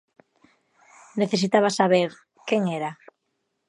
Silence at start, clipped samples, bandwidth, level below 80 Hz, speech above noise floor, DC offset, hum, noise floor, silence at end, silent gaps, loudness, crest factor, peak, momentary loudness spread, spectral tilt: 1.15 s; under 0.1%; 11.5 kHz; -76 dBFS; 54 dB; under 0.1%; none; -76 dBFS; 0.75 s; none; -23 LUFS; 22 dB; -4 dBFS; 14 LU; -5 dB/octave